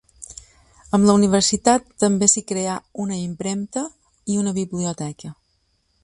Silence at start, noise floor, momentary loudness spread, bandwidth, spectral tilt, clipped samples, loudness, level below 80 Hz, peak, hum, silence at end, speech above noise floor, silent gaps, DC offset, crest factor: 0.2 s; -66 dBFS; 22 LU; 11.5 kHz; -4.5 dB/octave; under 0.1%; -20 LUFS; -52 dBFS; 0 dBFS; none; 0.7 s; 47 dB; none; under 0.1%; 22 dB